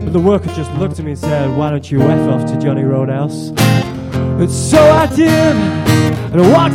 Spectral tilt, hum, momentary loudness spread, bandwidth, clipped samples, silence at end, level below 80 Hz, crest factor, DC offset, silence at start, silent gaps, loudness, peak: -6.5 dB/octave; none; 10 LU; 16.5 kHz; under 0.1%; 0 s; -36 dBFS; 12 dB; under 0.1%; 0 s; none; -13 LUFS; 0 dBFS